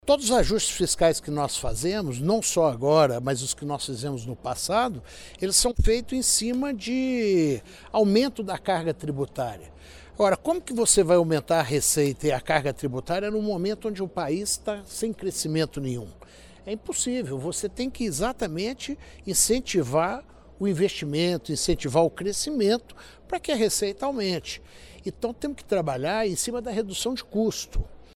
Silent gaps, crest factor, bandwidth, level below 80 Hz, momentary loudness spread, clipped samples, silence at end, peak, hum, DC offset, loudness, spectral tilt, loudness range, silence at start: none; 20 dB; 18 kHz; -40 dBFS; 11 LU; under 0.1%; 0.15 s; -6 dBFS; none; under 0.1%; -25 LUFS; -4 dB/octave; 6 LU; 0.05 s